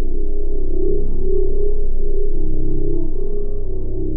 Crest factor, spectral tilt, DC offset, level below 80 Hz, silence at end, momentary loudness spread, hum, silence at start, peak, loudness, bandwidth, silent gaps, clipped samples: 6 dB; -17 dB/octave; under 0.1%; -14 dBFS; 0 s; 5 LU; none; 0 s; -6 dBFS; -25 LUFS; 0.9 kHz; none; under 0.1%